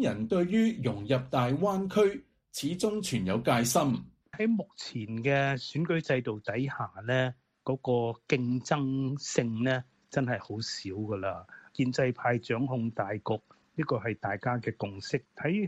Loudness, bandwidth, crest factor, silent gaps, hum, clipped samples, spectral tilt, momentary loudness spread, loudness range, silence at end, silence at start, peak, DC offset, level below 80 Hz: -31 LUFS; 14 kHz; 20 dB; none; none; under 0.1%; -5.5 dB/octave; 9 LU; 3 LU; 0 s; 0 s; -10 dBFS; under 0.1%; -64 dBFS